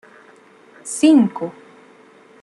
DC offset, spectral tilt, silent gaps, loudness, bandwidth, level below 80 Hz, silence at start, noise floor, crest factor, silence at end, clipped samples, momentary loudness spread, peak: under 0.1%; -5 dB/octave; none; -16 LUFS; 12 kHz; -72 dBFS; 0.85 s; -48 dBFS; 16 dB; 0.9 s; under 0.1%; 18 LU; -4 dBFS